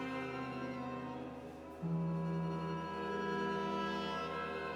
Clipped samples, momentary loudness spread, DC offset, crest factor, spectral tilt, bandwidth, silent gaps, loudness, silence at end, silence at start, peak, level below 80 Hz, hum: under 0.1%; 8 LU; under 0.1%; 12 dB; -7 dB/octave; 10.5 kHz; none; -40 LUFS; 0 s; 0 s; -26 dBFS; -64 dBFS; none